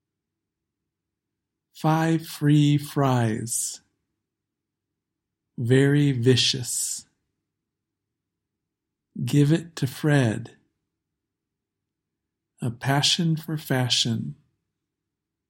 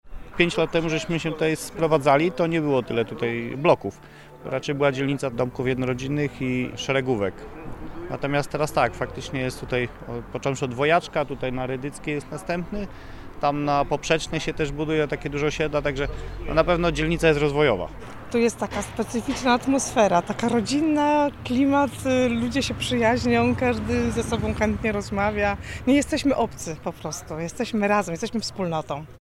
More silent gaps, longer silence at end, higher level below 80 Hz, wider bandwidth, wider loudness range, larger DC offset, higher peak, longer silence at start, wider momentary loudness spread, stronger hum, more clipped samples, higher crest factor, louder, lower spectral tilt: neither; first, 1.15 s vs 0.15 s; second, -64 dBFS vs -42 dBFS; about the same, 16.5 kHz vs 16 kHz; about the same, 4 LU vs 5 LU; neither; about the same, -6 dBFS vs -4 dBFS; first, 1.75 s vs 0.05 s; about the same, 13 LU vs 11 LU; neither; neither; about the same, 20 dB vs 20 dB; about the same, -23 LUFS vs -24 LUFS; about the same, -5 dB/octave vs -5.5 dB/octave